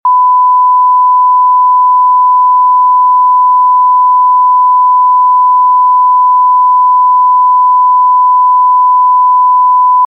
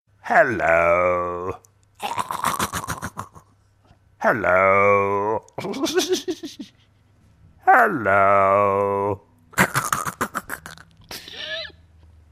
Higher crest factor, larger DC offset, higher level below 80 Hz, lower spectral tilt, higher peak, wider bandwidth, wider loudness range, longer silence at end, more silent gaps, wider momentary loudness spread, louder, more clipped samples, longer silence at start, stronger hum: second, 4 dB vs 20 dB; neither; second, under -90 dBFS vs -54 dBFS; about the same, -3 dB/octave vs -4 dB/octave; about the same, -2 dBFS vs -2 dBFS; second, 1.3 kHz vs 15.5 kHz; second, 0 LU vs 7 LU; second, 0 s vs 0.6 s; neither; second, 0 LU vs 19 LU; first, -6 LUFS vs -20 LUFS; neither; second, 0.05 s vs 0.25 s; neither